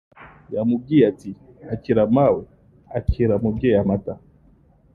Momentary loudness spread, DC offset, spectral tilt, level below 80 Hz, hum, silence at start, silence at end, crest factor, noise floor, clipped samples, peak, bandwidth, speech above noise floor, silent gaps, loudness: 18 LU; under 0.1%; -10 dB/octave; -38 dBFS; none; 0.2 s; 0.75 s; 18 dB; -54 dBFS; under 0.1%; -4 dBFS; 6.6 kHz; 35 dB; none; -20 LUFS